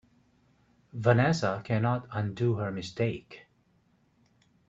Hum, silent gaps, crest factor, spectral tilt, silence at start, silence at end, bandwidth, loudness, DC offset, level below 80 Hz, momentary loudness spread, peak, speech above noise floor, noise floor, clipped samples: none; none; 22 dB; -7 dB/octave; 0.95 s; 1.3 s; 7.8 kHz; -29 LUFS; under 0.1%; -64 dBFS; 19 LU; -8 dBFS; 39 dB; -68 dBFS; under 0.1%